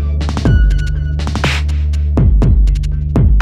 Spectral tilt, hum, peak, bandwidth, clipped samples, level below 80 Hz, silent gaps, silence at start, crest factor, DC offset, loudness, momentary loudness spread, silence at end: -7 dB/octave; none; -2 dBFS; 9.2 kHz; under 0.1%; -12 dBFS; none; 0 s; 8 dB; under 0.1%; -14 LUFS; 6 LU; 0 s